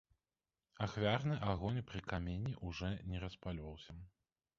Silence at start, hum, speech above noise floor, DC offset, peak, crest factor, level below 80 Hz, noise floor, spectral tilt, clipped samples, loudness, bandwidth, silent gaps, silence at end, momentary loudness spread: 0.8 s; none; over 49 dB; under 0.1%; -20 dBFS; 22 dB; -56 dBFS; under -90 dBFS; -5.5 dB/octave; under 0.1%; -41 LUFS; 7.4 kHz; none; 0.5 s; 14 LU